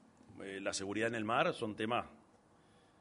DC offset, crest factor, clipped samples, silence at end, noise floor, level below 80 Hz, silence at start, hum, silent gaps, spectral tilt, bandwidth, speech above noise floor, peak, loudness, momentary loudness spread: under 0.1%; 22 dB; under 0.1%; 0.85 s; -67 dBFS; -74 dBFS; 0.3 s; none; none; -4 dB/octave; 10.5 kHz; 30 dB; -18 dBFS; -37 LUFS; 14 LU